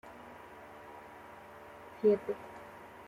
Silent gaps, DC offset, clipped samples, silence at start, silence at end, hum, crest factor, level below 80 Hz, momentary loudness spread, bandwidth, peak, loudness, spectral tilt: none; under 0.1%; under 0.1%; 0.05 s; 0 s; none; 22 dB; -72 dBFS; 21 LU; 14.5 kHz; -16 dBFS; -32 LUFS; -7 dB/octave